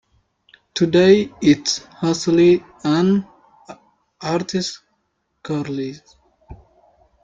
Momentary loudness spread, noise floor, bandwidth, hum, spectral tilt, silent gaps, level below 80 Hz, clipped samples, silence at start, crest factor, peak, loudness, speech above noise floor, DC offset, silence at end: 15 LU; -70 dBFS; 7.8 kHz; none; -5.5 dB/octave; none; -54 dBFS; under 0.1%; 0.75 s; 18 dB; -2 dBFS; -18 LUFS; 53 dB; under 0.1%; 0.7 s